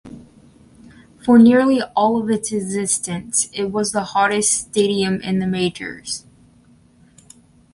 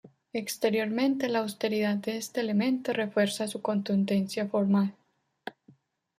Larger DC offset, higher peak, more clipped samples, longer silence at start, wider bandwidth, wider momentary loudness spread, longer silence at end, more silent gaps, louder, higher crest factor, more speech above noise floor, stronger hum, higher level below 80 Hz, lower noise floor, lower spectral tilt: neither; first, -2 dBFS vs -14 dBFS; neither; about the same, 0.05 s vs 0.05 s; second, 11.5 kHz vs 15.5 kHz; first, 14 LU vs 9 LU; first, 1.55 s vs 0.7 s; neither; first, -18 LUFS vs -29 LUFS; about the same, 18 dB vs 16 dB; about the same, 34 dB vs 34 dB; neither; first, -54 dBFS vs -74 dBFS; second, -52 dBFS vs -61 dBFS; second, -4 dB/octave vs -5.5 dB/octave